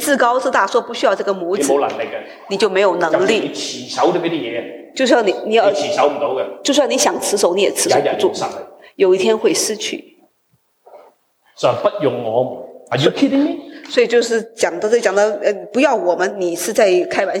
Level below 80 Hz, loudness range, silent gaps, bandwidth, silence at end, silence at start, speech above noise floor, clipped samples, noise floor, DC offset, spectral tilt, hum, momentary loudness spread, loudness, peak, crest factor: -68 dBFS; 4 LU; none; 17 kHz; 0 s; 0 s; 46 dB; under 0.1%; -62 dBFS; under 0.1%; -3.5 dB/octave; none; 10 LU; -16 LUFS; -2 dBFS; 16 dB